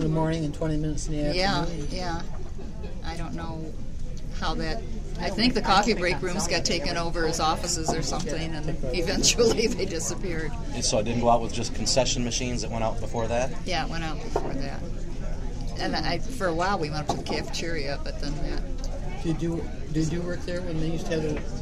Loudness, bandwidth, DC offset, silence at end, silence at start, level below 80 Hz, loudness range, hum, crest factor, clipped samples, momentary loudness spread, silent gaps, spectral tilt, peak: -28 LUFS; 13.5 kHz; under 0.1%; 0 s; 0 s; -32 dBFS; 6 LU; none; 20 dB; under 0.1%; 13 LU; none; -4 dB/octave; -6 dBFS